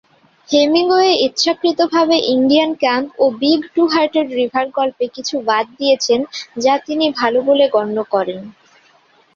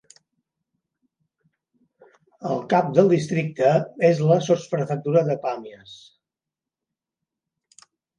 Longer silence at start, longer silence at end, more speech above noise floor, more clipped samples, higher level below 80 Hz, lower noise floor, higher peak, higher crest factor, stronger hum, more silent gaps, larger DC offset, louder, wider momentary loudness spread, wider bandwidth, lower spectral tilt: second, 0.5 s vs 2.4 s; second, 0.85 s vs 2.2 s; second, 38 dB vs 68 dB; neither; first, -62 dBFS vs -70 dBFS; second, -53 dBFS vs -88 dBFS; about the same, 0 dBFS vs -2 dBFS; second, 16 dB vs 22 dB; neither; neither; neither; first, -15 LUFS vs -21 LUFS; second, 6 LU vs 11 LU; second, 7.6 kHz vs 9.8 kHz; second, -3 dB/octave vs -7 dB/octave